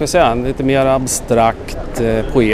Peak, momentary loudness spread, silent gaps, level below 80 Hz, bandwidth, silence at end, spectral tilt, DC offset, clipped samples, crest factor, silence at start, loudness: 0 dBFS; 6 LU; none; -28 dBFS; 16 kHz; 0 s; -5 dB/octave; under 0.1%; under 0.1%; 14 dB; 0 s; -15 LUFS